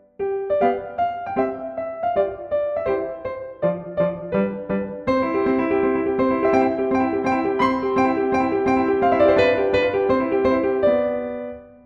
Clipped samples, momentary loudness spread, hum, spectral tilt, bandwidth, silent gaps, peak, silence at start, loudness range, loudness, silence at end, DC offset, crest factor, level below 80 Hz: under 0.1%; 8 LU; none; -7.5 dB/octave; 7.2 kHz; none; -4 dBFS; 0.2 s; 6 LU; -21 LUFS; 0.15 s; under 0.1%; 16 dB; -50 dBFS